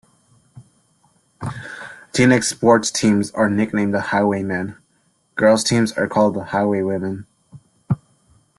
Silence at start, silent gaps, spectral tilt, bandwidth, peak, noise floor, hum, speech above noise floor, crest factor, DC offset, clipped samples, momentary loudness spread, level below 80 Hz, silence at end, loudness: 0.55 s; none; -5 dB/octave; 12.5 kHz; -2 dBFS; -63 dBFS; none; 45 dB; 18 dB; under 0.1%; under 0.1%; 16 LU; -56 dBFS; 0.6 s; -18 LUFS